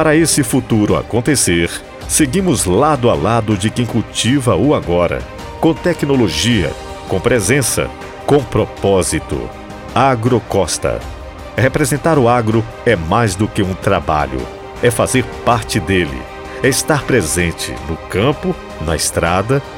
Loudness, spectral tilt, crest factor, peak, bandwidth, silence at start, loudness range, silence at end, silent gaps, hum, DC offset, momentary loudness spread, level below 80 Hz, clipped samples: -15 LUFS; -4.5 dB/octave; 14 dB; 0 dBFS; 17 kHz; 0 s; 2 LU; 0 s; none; none; under 0.1%; 10 LU; -32 dBFS; under 0.1%